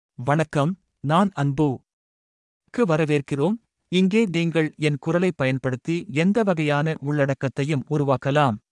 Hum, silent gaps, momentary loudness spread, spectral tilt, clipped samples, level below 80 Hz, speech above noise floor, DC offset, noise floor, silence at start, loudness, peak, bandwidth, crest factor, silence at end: none; 1.93-2.61 s; 6 LU; -7 dB/octave; under 0.1%; -60 dBFS; over 68 dB; under 0.1%; under -90 dBFS; 0.2 s; -23 LUFS; -6 dBFS; 11.5 kHz; 16 dB; 0.15 s